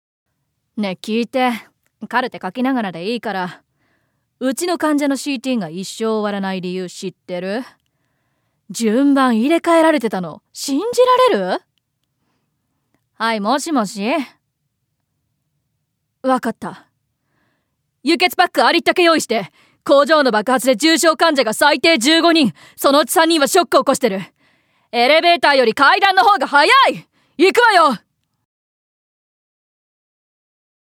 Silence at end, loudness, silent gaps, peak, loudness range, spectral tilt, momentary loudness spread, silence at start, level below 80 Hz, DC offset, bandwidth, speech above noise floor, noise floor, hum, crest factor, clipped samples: 2.85 s; -15 LUFS; none; 0 dBFS; 10 LU; -3 dB/octave; 14 LU; 0.75 s; -68 dBFS; under 0.1%; 18.5 kHz; 56 dB; -72 dBFS; none; 18 dB; under 0.1%